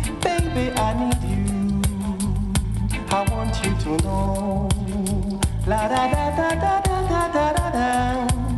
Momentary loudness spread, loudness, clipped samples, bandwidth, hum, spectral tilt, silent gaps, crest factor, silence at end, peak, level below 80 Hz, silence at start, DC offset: 4 LU; -22 LUFS; under 0.1%; 12.5 kHz; none; -5.5 dB/octave; none; 14 dB; 0 s; -8 dBFS; -28 dBFS; 0 s; under 0.1%